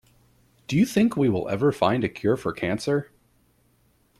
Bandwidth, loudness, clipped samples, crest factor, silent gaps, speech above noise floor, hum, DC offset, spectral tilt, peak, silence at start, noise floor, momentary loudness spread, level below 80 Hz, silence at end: 14.5 kHz; -24 LUFS; under 0.1%; 20 dB; none; 41 dB; none; under 0.1%; -6.5 dB/octave; -6 dBFS; 0.7 s; -64 dBFS; 6 LU; -58 dBFS; 1.15 s